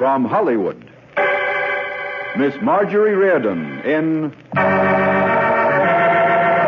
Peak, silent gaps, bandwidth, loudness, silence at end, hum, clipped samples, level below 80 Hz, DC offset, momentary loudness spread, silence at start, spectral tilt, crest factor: -6 dBFS; none; 6.6 kHz; -17 LUFS; 0 s; none; under 0.1%; -60 dBFS; under 0.1%; 9 LU; 0 s; -8 dB/octave; 12 dB